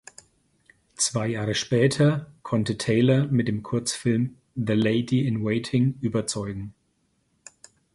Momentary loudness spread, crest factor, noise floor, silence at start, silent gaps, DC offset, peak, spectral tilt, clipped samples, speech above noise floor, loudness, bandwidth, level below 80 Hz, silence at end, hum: 10 LU; 18 dB; -70 dBFS; 1 s; none; under 0.1%; -8 dBFS; -5.5 dB/octave; under 0.1%; 46 dB; -24 LUFS; 11.5 kHz; -56 dBFS; 1.25 s; none